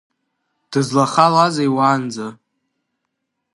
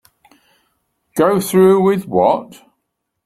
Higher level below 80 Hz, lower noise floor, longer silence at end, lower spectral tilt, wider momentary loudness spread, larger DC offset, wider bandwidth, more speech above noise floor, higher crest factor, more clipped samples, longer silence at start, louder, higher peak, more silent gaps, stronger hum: second, -68 dBFS vs -58 dBFS; about the same, -76 dBFS vs -74 dBFS; first, 1.2 s vs 0.8 s; about the same, -5.5 dB/octave vs -6.5 dB/octave; first, 14 LU vs 8 LU; neither; second, 11.5 kHz vs 15.5 kHz; about the same, 60 dB vs 60 dB; about the same, 20 dB vs 16 dB; neither; second, 0.7 s vs 1.15 s; about the same, -16 LUFS vs -14 LUFS; about the same, 0 dBFS vs -2 dBFS; neither; neither